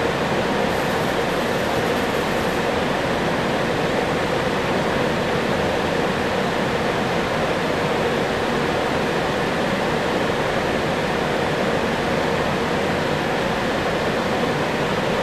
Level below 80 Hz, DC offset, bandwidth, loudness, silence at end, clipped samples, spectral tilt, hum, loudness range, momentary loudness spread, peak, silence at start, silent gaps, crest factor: -42 dBFS; 0.3%; 13.5 kHz; -21 LUFS; 0 s; under 0.1%; -5 dB/octave; none; 0 LU; 1 LU; -8 dBFS; 0 s; none; 14 dB